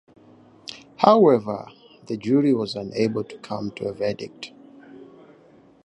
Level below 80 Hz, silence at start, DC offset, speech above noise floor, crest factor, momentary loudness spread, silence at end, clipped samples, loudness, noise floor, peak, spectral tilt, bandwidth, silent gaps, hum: -64 dBFS; 0.7 s; under 0.1%; 32 dB; 22 dB; 23 LU; 0.8 s; under 0.1%; -22 LUFS; -53 dBFS; 0 dBFS; -7 dB/octave; 10.5 kHz; none; none